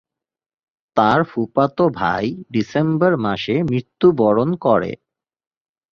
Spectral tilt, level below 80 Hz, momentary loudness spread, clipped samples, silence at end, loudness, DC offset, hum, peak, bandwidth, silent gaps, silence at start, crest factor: -8 dB/octave; -52 dBFS; 7 LU; under 0.1%; 1 s; -18 LUFS; under 0.1%; none; 0 dBFS; 6.8 kHz; none; 0.95 s; 18 dB